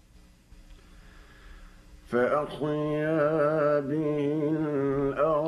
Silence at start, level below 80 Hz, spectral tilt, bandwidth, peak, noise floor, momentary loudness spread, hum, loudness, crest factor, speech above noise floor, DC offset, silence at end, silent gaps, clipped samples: 0.6 s; -54 dBFS; -8.5 dB/octave; 11.5 kHz; -14 dBFS; -56 dBFS; 4 LU; none; -27 LUFS; 16 dB; 30 dB; under 0.1%; 0 s; none; under 0.1%